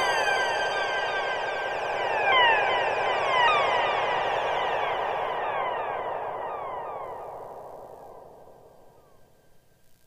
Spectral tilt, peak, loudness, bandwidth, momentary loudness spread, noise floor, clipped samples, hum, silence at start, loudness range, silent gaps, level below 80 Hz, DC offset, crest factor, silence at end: -2 dB/octave; -10 dBFS; -25 LUFS; 15.5 kHz; 19 LU; -57 dBFS; under 0.1%; none; 0 s; 15 LU; none; -60 dBFS; under 0.1%; 18 dB; 0.1 s